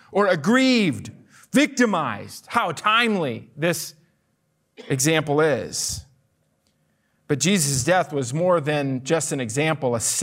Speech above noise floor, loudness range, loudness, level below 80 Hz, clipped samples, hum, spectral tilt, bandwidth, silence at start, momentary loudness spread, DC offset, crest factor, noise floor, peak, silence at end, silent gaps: 48 dB; 4 LU; -21 LUFS; -58 dBFS; under 0.1%; none; -4 dB/octave; 16 kHz; 0.1 s; 10 LU; under 0.1%; 16 dB; -69 dBFS; -6 dBFS; 0 s; none